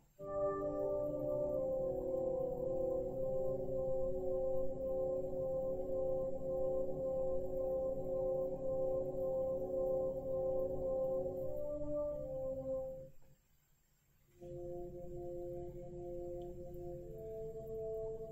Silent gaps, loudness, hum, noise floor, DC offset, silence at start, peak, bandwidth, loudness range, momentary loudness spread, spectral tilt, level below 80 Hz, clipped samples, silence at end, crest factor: none; -40 LUFS; none; -73 dBFS; under 0.1%; 0.2 s; -26 dBFS; 15 kHz; 9 LU; 10 LU; -10 dB/octave; -54 dBFS; under 0.1%; 0 s; 12 dB